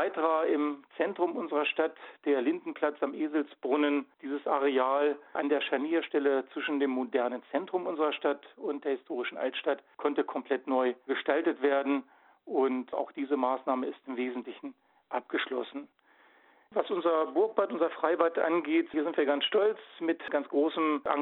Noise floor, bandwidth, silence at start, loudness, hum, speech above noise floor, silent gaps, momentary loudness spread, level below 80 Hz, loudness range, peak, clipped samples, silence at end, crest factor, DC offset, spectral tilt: -62 dBFS; 4.2 kHz; 0 s; -31 LUFS; none; 32 dB; none; 8 LU; -84 dBFS; 5 LU; -12 dBFS; under 0.1%; 0 s; 20 dB; under 0.1%; -7.5 dB/octave